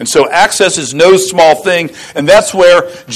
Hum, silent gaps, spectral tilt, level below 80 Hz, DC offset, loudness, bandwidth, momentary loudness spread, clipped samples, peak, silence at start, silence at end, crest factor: none; none; -3 dB/octave; -44 dBFS; under 0.1%; -8 LUFS; 14 kHz; 6 LU; 0.7%; 0 dBFS; 0 s; 0 s; 8 dB